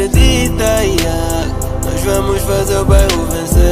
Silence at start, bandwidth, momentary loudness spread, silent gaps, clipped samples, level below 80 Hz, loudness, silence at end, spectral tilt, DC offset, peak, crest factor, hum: 0 s; 16 kHz; 7 LU; none; under 0.1%; -16 dBFS; -14 LUFS; 0 s; -5 dB/octave; under 0.1%; 0 dBFS; 12 dB; none